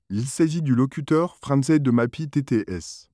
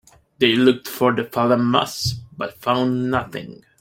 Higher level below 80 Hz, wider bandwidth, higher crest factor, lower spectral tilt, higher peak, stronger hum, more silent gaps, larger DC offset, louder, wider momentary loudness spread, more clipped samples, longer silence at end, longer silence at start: about the same, -56 dBFS vs -54 dBFS; second, 11 kHz vs 16.5 kHz; second, 14 dB vs 20 dB; first, -7 dB/octave vs -5 dB/octave; second, -8 dBFS vs -2 dBFS; neither; neither; neither; second, -22 LUFS vs -19 LUFS; second, 8 LU vs 14 LU; neither; about the same, 0.15 s vs 0.25 s; second, 0.1 s vs 0.4 s